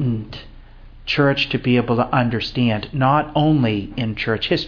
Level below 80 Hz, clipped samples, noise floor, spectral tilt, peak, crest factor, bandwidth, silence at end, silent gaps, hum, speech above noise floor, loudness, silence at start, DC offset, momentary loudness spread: -40 dBFS; under 0.1%; -40 dBFS; -7.5 dB/octave; -4 dBFS; 16 dB; 5.4 kHz; 0 s; none; none; 22 dB; -19 LUFS; 0 s; under 0.1%; 9 LU